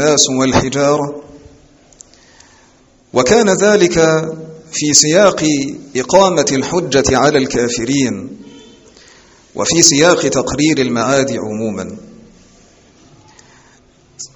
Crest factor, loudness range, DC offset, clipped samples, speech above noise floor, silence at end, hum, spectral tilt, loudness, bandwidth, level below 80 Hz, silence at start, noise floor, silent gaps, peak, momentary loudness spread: 14 dB; 6 LU; under 0.1%; under 0.1%; 36 dB; 0.1 s; none; -3.5 dB/octave; -12 LUFS; over 20 kHz; -42 dBFS; 0 s; -49 dBFS; none; 0 dBFS; 15 LU